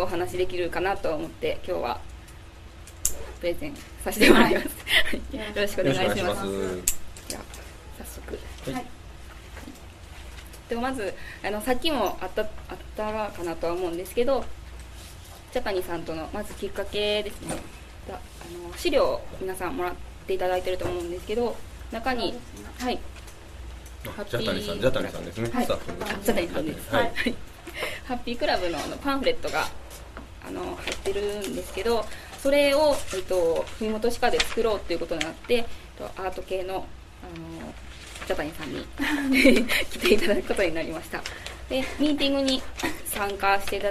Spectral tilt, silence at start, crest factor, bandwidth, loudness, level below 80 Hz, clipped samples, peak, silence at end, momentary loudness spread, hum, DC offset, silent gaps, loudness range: -4 dB/octave; 0 s; 26 dB; 14 kHz; -27 LUFS; -42 dBFS; under 0.1%; 0 dBFS; 0 s; 20 LU; none; under 0.1%; none; 9 LU